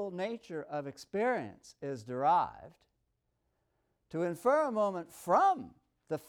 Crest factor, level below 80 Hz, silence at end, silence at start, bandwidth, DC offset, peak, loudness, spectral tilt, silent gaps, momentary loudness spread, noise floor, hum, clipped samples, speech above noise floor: 18 dB; -74 dBFS; 0.05 s; 0 s; 18 kHz; under 0.1%; -16 dBFS; -33 LUFS; -6 dB/octave; none; 14 LU; -80 dBFS; none; under 0.1%; 48 dB